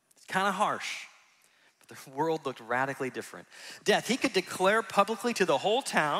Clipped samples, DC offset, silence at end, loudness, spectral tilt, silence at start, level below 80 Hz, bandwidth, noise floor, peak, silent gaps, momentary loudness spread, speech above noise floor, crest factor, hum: under 0.1%; under 0.1%; 0 s; -29 LUFS; -3.5 dB/octave; 0.3 s; -78 dBFS; 16 kHz; -65 dBFS; -8 dBFS; none; 16 LU; 35 dB; 22 dB; none